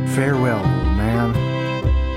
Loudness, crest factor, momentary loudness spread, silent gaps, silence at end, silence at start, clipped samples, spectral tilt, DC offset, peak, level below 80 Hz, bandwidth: -19 LUFS; 12 dB; 3 LU; none; 0 s; 0 s; under 0.1%; -7 dB/octave; under 0.1%; -6 dBFS; -24 dBFS; 15 kHz